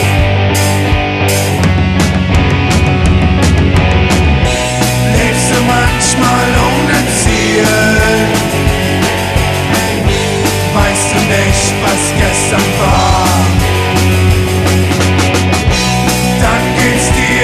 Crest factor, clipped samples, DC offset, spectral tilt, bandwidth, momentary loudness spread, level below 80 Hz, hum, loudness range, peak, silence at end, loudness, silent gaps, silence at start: 10 dB; under 0.1%; under 0.1%; -4.5 dB/octave; 14 kHz; 2 LU; -20 dBFS; none; 1 LU; 0 dBFS; 0 s; -10 LUFS; none; 0 s